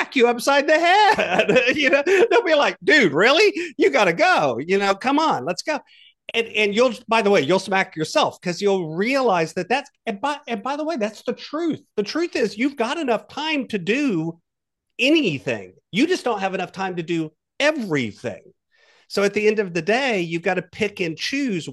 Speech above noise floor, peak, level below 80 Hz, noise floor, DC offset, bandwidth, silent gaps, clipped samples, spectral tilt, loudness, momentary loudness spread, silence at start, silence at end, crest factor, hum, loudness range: 60 dB; -4 dBFS; -66 dBFS; -80 dBFS; under 0.1%; 12.5 kHz; none; under 0.1%; -4.5 dB/octave; -20 LUFS; 11 LU; 0 s; 0 s; 18 dB; none; 8 LU